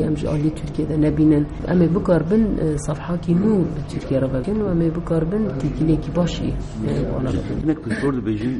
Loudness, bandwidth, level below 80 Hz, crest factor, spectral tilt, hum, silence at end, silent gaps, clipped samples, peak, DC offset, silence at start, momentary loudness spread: -21 LUFS; 11 kHz; -32 dBFS; 14 dB; -8 dB/octave; none; 0 s; none; under 0.1%; -6 dBFS; under 0.1%; 0 s; 7 LU